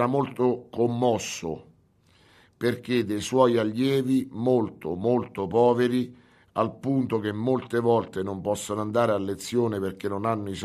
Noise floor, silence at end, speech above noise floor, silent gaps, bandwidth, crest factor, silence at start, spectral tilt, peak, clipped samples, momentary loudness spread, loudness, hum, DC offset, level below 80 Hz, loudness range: -61 dBFS; 0 s; 36 dB; none; 14.5 kHz; 20 dB; 0 s; -6 dB/octave; -6 dBFS; under 0.1%; 8 LU; -26 LUFS; none; under 0.1%; -62 dBFS; 3 LU